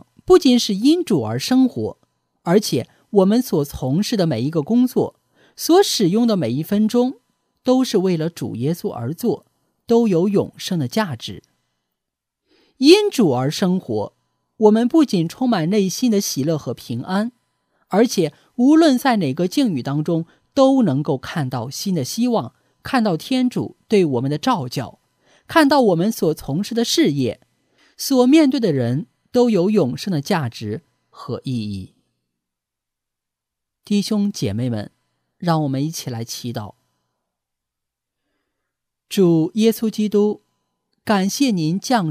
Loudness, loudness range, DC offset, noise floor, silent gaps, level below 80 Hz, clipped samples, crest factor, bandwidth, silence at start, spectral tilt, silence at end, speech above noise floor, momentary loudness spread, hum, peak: -19 LUFS; 8 LU; under 0.1%; -83 dBFS; none; -56 dBFS; under 0.1%; 20 dB; 16 kHz; 0.3 s; -5.5 dB/octave; 0 s; 65 dB; 13 LU; none; 0 dBFS